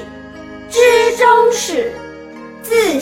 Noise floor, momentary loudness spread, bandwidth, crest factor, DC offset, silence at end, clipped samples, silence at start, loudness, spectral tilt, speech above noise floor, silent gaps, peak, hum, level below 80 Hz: -33 dBFS; 23 LU; 16.5 kHz; 14 dB; under 0.1%; 0 s; under 0.1%; 0 s; -13 LUFS; -2 dB/octave; 20 dB; none; 0 dBFS; none; -50 dBFS